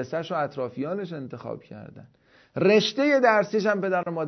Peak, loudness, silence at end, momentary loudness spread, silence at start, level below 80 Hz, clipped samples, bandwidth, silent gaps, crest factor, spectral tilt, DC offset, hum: -6 dBFS; -23 LUFS; 0 s; 18 LU; 0 s; -70 dBFS; under 0.1%; 6.4 kHz; none; 18 dB; -5.5 dB/octave; under 0.1%; none